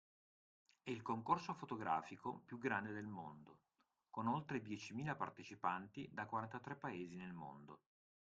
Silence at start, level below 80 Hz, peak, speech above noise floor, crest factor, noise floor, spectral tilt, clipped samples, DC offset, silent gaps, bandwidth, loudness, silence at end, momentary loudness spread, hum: 0.85 s; -82 dBFS; -24 dBFS; 40 dB; 24 dB; -86 dBFS; -6 dB/octave; under 0.1%; under 0.1%; none; 9 kHz; -46 LUFS; 0.45 s; 13 LU; none